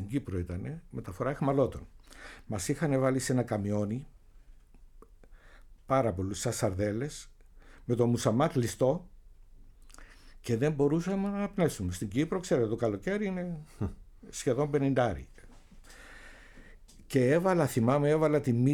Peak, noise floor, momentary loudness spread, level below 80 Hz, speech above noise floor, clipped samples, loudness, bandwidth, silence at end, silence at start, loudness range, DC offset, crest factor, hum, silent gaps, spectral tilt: -14 dBFS; -54 dBFS; 15 LU; -52 dBFS; 25 dB; under 0.1%; -30 LUFS; 18 kHz; 0 s; 0 s; 4 LU; under 0.1%; 18 dB; none; none; -6.5 dB/octave